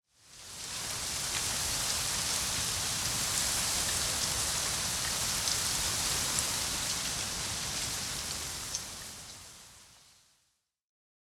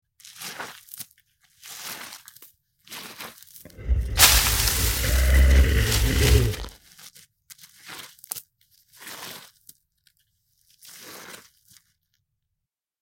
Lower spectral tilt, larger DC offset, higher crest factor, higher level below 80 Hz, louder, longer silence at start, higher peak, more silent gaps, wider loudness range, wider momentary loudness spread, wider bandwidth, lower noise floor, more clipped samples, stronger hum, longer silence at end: second, -0.5 dB/octave vs -3 dB/octave; neither; about the same, 22 dB vs 24 dB; second, -52 dBFS vs -28 dBFS; second, -30 LUFS vs -21 LUFS; second, 0.25 s vs 0.4 s; second, -12 dBFS vs 0 dBFS; neither; second, 7 LU vs 21 LU; second, 13 LU vs 24 LU; about the same, 17.5 kHz vs 17 kHz; second, -76 dBFS vs -83 dBFS; neither; neither; second, 1.25 s vs 1.65 s